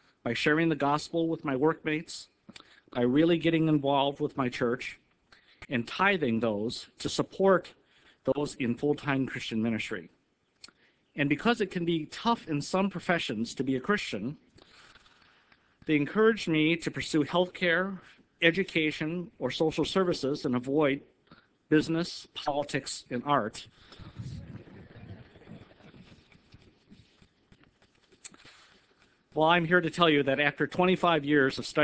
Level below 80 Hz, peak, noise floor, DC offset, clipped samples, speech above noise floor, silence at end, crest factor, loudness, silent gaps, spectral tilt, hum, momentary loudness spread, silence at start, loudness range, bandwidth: -62 dBFS; -6 dBFS; -66 dBFS; under 0.1%; under 0.1%; 37 dB; 0 s; 24 dB; -28 LUFS; none; -5.5 dB/octave; none; 17 LU; 0.25 s; 6 LU; 8 kHz